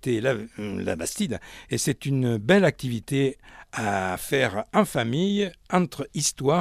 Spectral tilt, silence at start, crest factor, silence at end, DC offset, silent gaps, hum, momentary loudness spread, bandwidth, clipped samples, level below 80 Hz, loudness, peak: -5 dB/octave; 0.05 s; 20 dB; 0 s; under 0.1%; none; none; 10 LU; 16 kHz; under 0.1%; -54 dBFS; -25 LUFS; -6 dBFS